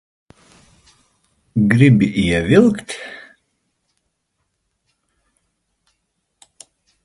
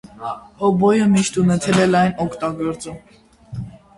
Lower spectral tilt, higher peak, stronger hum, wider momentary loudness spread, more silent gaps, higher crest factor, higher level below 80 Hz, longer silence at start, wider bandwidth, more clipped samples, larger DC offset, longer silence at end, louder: about the same, -7 dB/octave vs -6 dB/octave; about the same, 0 dBFS vs -2 dBFS; neither; about the same, 19 LU vs 18 LU; neither; about the same, 20 dB vs 16 dB; about the same, -44 dBFS vs -48 dBFS; first, 1.55 s vs 0.2 s; about the same, 11.5 kHz vs 11.5 kHz; neither; neither; first, 3.9 s vs 0.25 s; about the same, -15 LUFS vs -17 LUFS